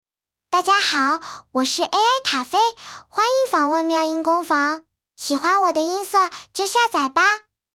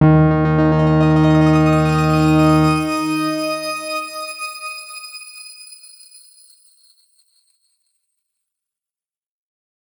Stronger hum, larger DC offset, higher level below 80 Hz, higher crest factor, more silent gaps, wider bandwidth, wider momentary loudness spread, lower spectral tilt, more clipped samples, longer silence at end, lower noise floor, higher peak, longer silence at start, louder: neither; neither; second, -68 dBFS vs -40 dBFS; about the same, 16 dB vs 16 dB; neither; second, 17 kHz vs over 20 kHz; second, 9 LU vs 19 LU; second, -0.5 dB/octave vs -7 dB/octave; neither; second, 0.35 s vs 4.25 s; second, -51 dBFS vs under -90 dBFS; second, -6 dBFS vs -2 dBFS; first, 0.5 s vs 0 s; second, -19 LUFS vs -16 LUFS